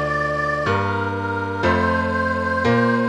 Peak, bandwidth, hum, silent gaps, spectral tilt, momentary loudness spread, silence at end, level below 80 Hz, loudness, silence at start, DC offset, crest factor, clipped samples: -6 dBFS; 10.5 kHz; none; none; -7 dB/octave; 5 LU; 0 s; -42 dBFS; -20 LUFS; 0 s; under 0.1%; 14 dB; under 0.1%